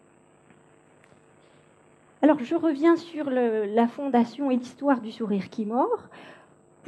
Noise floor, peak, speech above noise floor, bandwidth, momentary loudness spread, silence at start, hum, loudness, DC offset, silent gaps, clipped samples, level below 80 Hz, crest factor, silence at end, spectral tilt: -58 dBFS; -8 dBFS; 34 dB; 8.8 kHz; 7 LU; 2.2 s; none; -25 LUFS; under 0.1%; none; under 0.1%; -80 dBFS; 20 dB; 0.55 s; -7 dB/octave